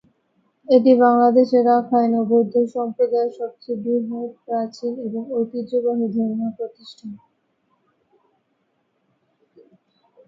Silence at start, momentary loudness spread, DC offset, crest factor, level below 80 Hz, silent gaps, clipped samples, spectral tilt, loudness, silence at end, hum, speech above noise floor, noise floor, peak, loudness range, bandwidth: 0.7 s; 17 LU; under 0.1%; 18 dB; -74 dBFS; none; under 0.1%; -8 dB/octave; -19 LUFS; 3.1 s; none; 50 dB; -69 dBFS; -2 dBFS; 12 LU; 7.2 kHz